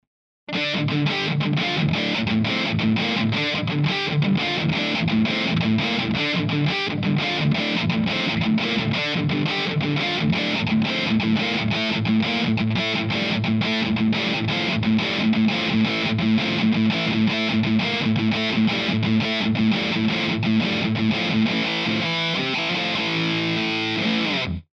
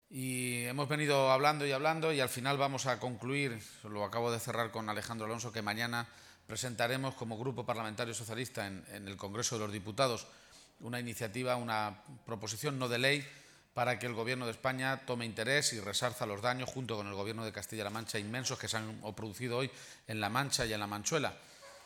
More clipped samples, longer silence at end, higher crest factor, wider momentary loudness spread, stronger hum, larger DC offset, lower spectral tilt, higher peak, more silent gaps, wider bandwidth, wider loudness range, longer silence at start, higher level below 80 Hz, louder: neither; first, 0.15 s vs 0 s; second, 12 dB vs 22 dB; second, 2 LU vs 11 LU; neither; neither; first, -6 dB/octave vs -3.5 dB/octave; first, -8 dBFS vs -14 dBFS; neither; second, 7.4 kHz vs 19.5 kHz; second, 1 LU vs 6 LU; first, 0.5 s vs 0.1 s; first, -52 dBFS vs -70 dBFS; first, -21 LUFS vs -36 LUFS